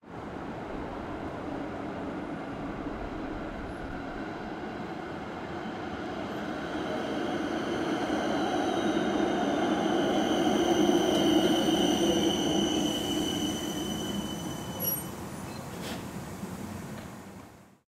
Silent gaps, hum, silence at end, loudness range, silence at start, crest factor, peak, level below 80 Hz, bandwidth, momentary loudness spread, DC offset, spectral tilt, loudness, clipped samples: none; none; 0.2 s; 11 LU; 0.05 s; 18 dB; -12 dBFS; -52 dBFS; 16 kHz; 14 LU; under 0.1%; -4.5 dB/octave; -31 LUFS; under 0.1%